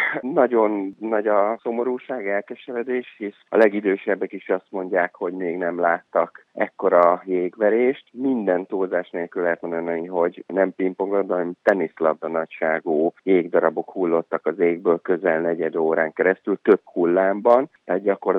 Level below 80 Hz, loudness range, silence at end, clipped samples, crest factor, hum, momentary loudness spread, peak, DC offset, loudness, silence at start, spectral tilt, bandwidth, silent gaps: -82 dBFS; 3 LU; 0 s; under 0.1%; 18 dB; none; 8 LU; -2 dBFS; under 0.1%; -22 LUFS; 0 s; -8.5 dB/octave; 5.4 kHz; none